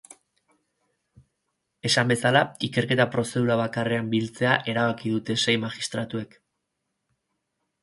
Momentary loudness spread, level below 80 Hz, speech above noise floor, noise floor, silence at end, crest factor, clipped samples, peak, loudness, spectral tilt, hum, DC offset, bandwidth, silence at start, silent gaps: 9 LU; -64 dBFS; 55 dB; -80 dBFS; 1.55 s; 22 dB; under 0.1%; -4 dBFS; -24 LUFS; -4.5 dB/octave; none; under 0.1%; 11.5 kHz; 1.85 s; none